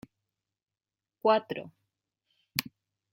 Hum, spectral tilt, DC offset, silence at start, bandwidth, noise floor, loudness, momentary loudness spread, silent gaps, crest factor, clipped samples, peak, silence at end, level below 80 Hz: none; -3.5 dB/octave; under 0.1%; 1.25 s; 16.5 kHz; under -90 dBFS; -30 LUFS; 14 LU; none; 30 dB; under 0.1%; -4 dBFS; 0.5 s; -74 dBFS